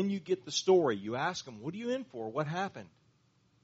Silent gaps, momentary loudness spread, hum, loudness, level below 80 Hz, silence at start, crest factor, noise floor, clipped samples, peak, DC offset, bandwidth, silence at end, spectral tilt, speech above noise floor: none; 13 LU; none; -33 LUFS; -76 dBFS; 0 s; 20 dB; -70 dBFS; under 0.1%; -14 dBFS; under 0.1%; 8 kHz; 0.75 s; -4 dB/octave; 37 dB